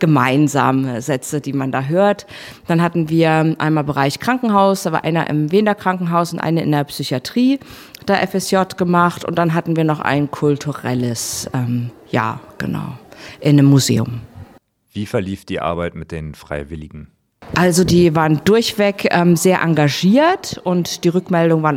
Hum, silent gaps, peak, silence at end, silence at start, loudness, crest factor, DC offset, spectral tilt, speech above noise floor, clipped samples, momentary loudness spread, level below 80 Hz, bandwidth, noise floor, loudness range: none; none; 0 dBFS; 0 s; 0 s; -16 LUFS; 16 dB; under 0.1%; -6 dB/octave; 33 dB; under 0.1%; 13 LU; -46 dBFS; 16.5 kHz; -49 dBFS; 6 LU